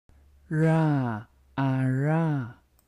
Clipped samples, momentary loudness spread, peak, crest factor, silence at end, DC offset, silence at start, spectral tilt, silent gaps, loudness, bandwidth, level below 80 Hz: under 0.1%; 14 LU; -14 dBFS; 14 dB; 0.35 s; under 0.1%; 0.5 s; -9 dB/octave; none; -26 LUFS; 10.5 kHz; -60 dBFS